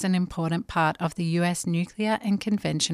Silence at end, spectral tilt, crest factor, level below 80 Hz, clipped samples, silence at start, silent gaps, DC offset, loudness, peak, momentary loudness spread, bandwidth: 0 s; -5 dB/octave; 16 dB; -54 dBFS; under 0.1%; 0 s; none; under 0.1%; -26 LUFS; -8 dBFS; 3 LU; 14 kHz